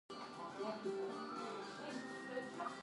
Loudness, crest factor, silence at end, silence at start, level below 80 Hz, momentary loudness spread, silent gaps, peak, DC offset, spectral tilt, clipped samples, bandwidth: -46 LUFS; 14 dB; 0 s; 0.1 s; -86 dBFS; 5 LU; none; -32 dBFS; under 0.1%; -4.5 dB/octave; under 0.1%; 11.5 kHz